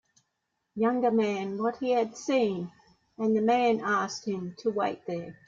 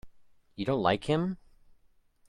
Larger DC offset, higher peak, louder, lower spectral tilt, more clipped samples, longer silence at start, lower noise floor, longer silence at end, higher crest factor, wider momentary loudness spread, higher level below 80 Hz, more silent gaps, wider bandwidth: neither; about the same, -12 dBFS vs -10 dBFS; about the same, -28 LUFS vs -30 LUFS; second, -5.5 dB/octave vs -7 dB/octave; neither; first, 0.75 s vs 0.05 s; first, -80 dBFS vs -64 dBFS; second, 0.15 s vs 0.95 s; second, 16 dB vs 22 dB; about the same, 11 LU vs 9 LU; second, -72 dBFS vs -58 dBFS; neither; second, 7.6 kHz vs 11 kHz